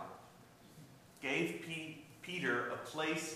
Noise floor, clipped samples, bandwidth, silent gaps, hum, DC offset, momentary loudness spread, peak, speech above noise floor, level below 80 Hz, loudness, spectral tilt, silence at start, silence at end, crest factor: -61 dBFS; under 0.1%; 15.5 kHz; none; none; under 0.1%; 23 LU; -22 dBFS; 21 dB; -80 dBFS; -39 LUFS; -4 dB/octave; 0 s; 0 s; 20 dB